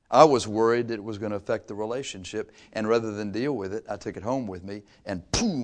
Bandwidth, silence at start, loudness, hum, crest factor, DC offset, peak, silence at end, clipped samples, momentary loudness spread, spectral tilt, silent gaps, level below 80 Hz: 10.5 kHz; 0.1 s; -27 LUFS; none; 26 dB; under 0.1%; 0 dBFS; 0 s; under 0.1%; 14 LU; -5 dB/octave; none; -52 dBFS